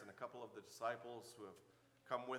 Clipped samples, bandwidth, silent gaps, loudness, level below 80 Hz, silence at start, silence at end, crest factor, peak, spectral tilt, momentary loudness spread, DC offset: under 0.1%; 18 kHz; none; -51 LUFS; under -90 dBFS; 0 s; 0 s; 24 dB; -26 dBFS; -4 dB/octave; 14 LU; under 0.1%